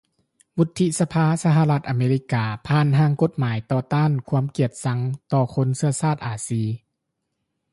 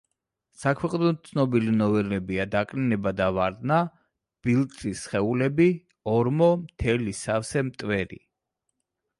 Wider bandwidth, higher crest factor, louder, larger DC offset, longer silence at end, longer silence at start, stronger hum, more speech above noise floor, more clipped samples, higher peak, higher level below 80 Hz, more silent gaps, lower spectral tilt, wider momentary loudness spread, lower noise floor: about the same, 11.5 kHz vs 11.5 kHz; about the same, 14 dB vs 16 dB; first, -22 LUFS vs -25 LUFS; neither; about the same, 0.95 s vs 1.05 s; about the same, 0.55 s vs 0.6 s; neither; about the same, 57 dB vs 57 dB; neither; first, -6 dBFS vs -10 dBFS; second, -56 dBFS vs -50 dBFS; neither; about the same, -7 dB/octave vs -7 dB/octave; about the same, 7 LU vs 7 LU; about the same, -78 dBFS vs -81 dBFS